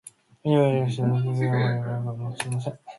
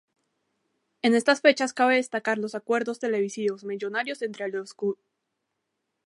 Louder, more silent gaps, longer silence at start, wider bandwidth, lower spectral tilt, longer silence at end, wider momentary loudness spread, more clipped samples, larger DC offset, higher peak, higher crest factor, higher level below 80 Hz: about the same, -25 LUFS vs -26 LUFS; neither; second, 0.45 s vs 1.05 s; about the same, 11.5 kHz vs 11.5 kHz; first, -7 dB/octave vs -3.5 dB/octave; second, 0 s vs 1.15 s; about the same, 10 LU vs 11 LU; neither; neither; second, -8 dBFS vs -4 dBFS; second, 16 dB vs 22 dB; first, -62 dBFS vs -82 dBFS